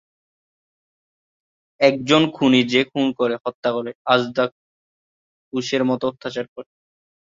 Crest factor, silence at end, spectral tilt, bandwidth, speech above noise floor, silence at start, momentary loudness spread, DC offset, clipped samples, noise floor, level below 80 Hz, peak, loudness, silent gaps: 20 dB; 0.75 s; -5 dB/octave; 7.6 kHz; over 70 dB; 1.8 s; 13 LU; under 0.1%; under 0.1%; under -90 dBFS; -64 dBFS; -2 dBFS; -20 LUFS; 3.54-3.63 s, 3.95-4.05 s, 4.52-5.51 s, 6.48-6.56 s